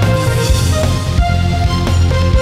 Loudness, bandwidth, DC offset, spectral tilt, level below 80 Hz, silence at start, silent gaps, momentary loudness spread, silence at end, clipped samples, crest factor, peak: -14 LUFS; 15 kHz; under 0.1%; -5.5 dB/octave; -18 dBFS; 0 s; none; 2 LU; 0 s; under 0.1%; 12 dB; 0 dBFS